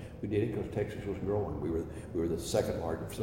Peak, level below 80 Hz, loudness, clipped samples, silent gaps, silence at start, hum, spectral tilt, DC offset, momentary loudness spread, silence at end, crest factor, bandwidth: -16 dBFS; -50 dBFS; -34 LUFS; under 0.1%; none; 0 s; none; -6.5 dB/octave; under 0.1%; 5 LU; 0 s; 18 dB; 16 kHz